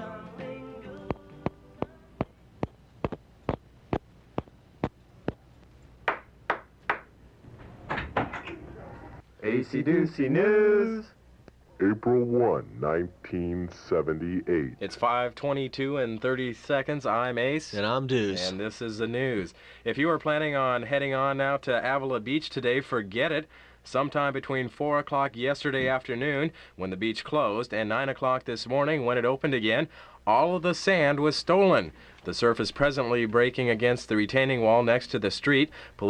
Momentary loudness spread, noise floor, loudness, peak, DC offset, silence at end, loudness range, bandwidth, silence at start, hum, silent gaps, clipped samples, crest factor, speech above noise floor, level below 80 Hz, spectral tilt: 15 LU; -54 dBFS; -27 LUFS; -8 dBFS; under 0.1%; 0 s; 12 LU; 10.5 kHz; 0 s; none; none; under 0.1%; 20 dB; 28 dB; -54 dBFS; -6 dB/octave